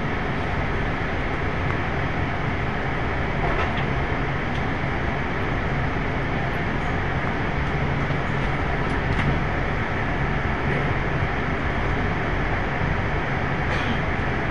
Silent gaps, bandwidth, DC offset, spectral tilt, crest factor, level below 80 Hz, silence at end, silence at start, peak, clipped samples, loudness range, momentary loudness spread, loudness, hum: none; 10 kHz; 2%; -7 dB/octave; 14 dB; -32 dBFS; 0 s; 0 s; -10 dBFS; under 0.1%; 1 LU; 2 LU; -25 LUFS; none